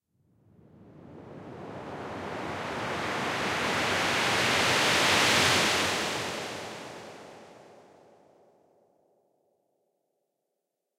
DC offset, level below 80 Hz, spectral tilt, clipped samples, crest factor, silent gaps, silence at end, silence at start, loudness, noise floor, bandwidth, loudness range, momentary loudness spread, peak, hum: under 0.1%; -62 dBFS; -2 dB/octave; under 0.1%; 22 dB; none; 3.25 s; 0.8 s; -26 LUFS; -84 dBFS; 16 kHz; 14 LU; 22 LU; -10 dBFS; none